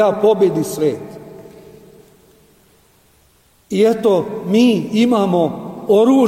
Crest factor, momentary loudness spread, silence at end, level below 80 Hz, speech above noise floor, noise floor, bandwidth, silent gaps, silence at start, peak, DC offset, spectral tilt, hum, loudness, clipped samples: 14 dB; 14 LU; 0 s; -56 dBFS; 40 dB; -54 dBFS; 16 kHz; none; 0 s; -2 dBFS; under 0.1%; -6.5 dB/octave; none; -15 LUFS; under 0.1%